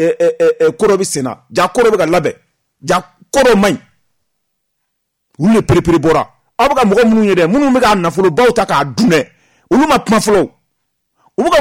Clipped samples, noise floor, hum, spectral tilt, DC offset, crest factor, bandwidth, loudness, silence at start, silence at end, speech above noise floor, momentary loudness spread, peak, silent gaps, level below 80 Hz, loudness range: under 0.1%; -70 dBFS; none; -5 dB/octave; under 0.1%; 10 dB; 16.5 kHz; -12 LUFS; 0 s; 0 s; 59 dB; 7 LU; -2 dBFS; none; -38 dBFS; 4 LU